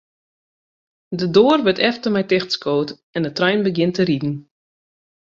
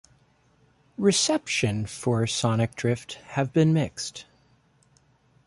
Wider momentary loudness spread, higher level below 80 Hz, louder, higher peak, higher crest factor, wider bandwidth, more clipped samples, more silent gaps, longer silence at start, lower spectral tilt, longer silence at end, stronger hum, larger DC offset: about the same, 11 LU vs 12 LU; about the same, -60 dBFS vs -58 dBFS; first, -18 LUFS vs -25 LUFS; first, -2 dBFS vs -10 dBFS; about the same, 18 dB vs 18 dB; second, 7.6 kHz vs 11.5 kHz; neither; first, 3.03-3.13 s vs none; about the same, 1.1 s vs 1 s; first, -6 dB/octave vs -4.5 dB/octave; second, 0.95 s vs 1.25 s; neither; neither